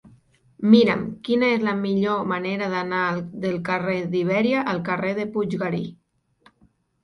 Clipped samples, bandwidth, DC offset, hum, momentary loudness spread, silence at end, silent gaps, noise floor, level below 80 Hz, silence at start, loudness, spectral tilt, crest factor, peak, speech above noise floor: under 0.1%; 6.4 kHz; under 0.1%; none; 10 LU; 1.1 s; none; -62 dBFS; -62 dBFS; 0.05 s; -22 LUFS; -7.5 dB/octave; 22 dB; -2 dBFS; 40 dB